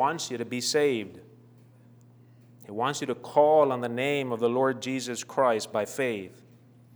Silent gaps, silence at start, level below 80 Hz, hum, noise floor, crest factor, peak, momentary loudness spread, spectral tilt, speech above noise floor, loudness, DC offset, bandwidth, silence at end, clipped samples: none; 0 s; -82 dBFS; none; -55 dBFS; 20 dB; -8 dBFS; 11 LU; -4 dB/octave; 28 dB; -27 LUFS; under 0.1%; over 20 kHz; 0.65 s; under 0.1%